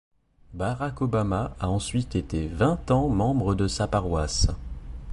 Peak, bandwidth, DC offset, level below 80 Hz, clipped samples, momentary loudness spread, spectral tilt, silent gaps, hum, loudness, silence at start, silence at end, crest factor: -10 dBFS; 11.5 kHz; under 0.1%; -34 dBFS; under 0.1%; 8 LU; -6 dB/octave; none; none; -26 LUFS; 0.5 s; 0 s; 16 dB